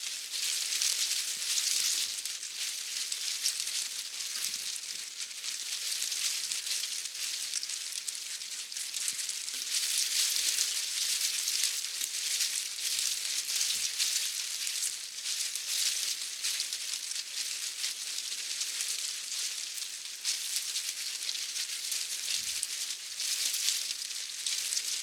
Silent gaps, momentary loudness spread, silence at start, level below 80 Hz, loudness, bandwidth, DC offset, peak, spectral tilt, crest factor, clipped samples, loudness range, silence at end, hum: none; 7 LU; 0 s; -86 dBFS; -31 LUFS; 18 kHz; under 0.1%; -10 dBFS; 5 dB/octave; 24 dB; under 0.1%; 4 LU; 0 s; none